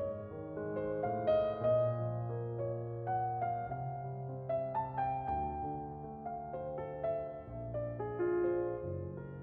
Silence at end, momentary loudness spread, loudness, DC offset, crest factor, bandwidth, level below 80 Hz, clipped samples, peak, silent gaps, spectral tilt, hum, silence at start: 0 s; 11 LU; -37 LUFS; under 0.1%; 16 dB; 4.8 kHz; -58 dBFS; under 0.1%; -20 dBFS; none; -8 dB/octave; none; 0 s